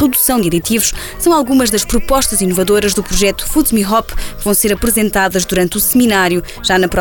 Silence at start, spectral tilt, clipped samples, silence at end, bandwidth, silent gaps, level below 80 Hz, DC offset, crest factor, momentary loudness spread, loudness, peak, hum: 0 s; -3.5 dB/octave; under 0.1%; 0 s; over 20 kHz; none; -26 dBFS; under 0.1%; 12 dB; 4 LU; -13 LUFS; -2 dBFS; none